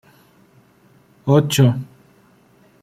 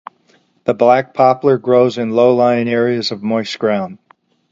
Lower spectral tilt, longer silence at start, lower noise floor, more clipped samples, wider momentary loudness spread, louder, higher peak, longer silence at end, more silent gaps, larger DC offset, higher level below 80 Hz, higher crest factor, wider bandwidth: about the same, -6 dB/octave vs -6.5 dB/octave; first, 1.25 s vs 0.65 s; about the same, -53 dBFS vs -56 dBFS; neither; first, 15 LU vs 8 LU; second, -17 LUFS vs -14 LUFS; about the same, -2 dBFS vs 0 dBFS; first, 1 s vs 0.55 s; neither; neither; about the same, -58 dBFS vs -60 dBFS; about the same, 18 dB vs 14 dB; first, 16 kHz vs 7.8 kHz